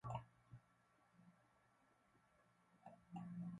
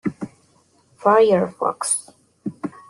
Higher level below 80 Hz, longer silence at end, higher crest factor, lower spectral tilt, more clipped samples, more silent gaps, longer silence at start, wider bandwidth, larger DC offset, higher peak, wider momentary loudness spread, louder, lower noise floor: second, -78 dBFS vs -64 dBFS; second, 0 s vs 0.2 s; about the same, 24 dB vs 20 dB; first, -8 dB/octave vs -4.5 dB/octave; neither; neither; about the same, 0.05 s vs 0.05 s; second, 11 kHz vs 12.5 kHz; neither; second, -34 dBFS vs -2 dBFS; second, 15 LU vs 19 LU; second, -56 LUFS vs -19 LUFS; first, -78 dBFS vs -59 dBFS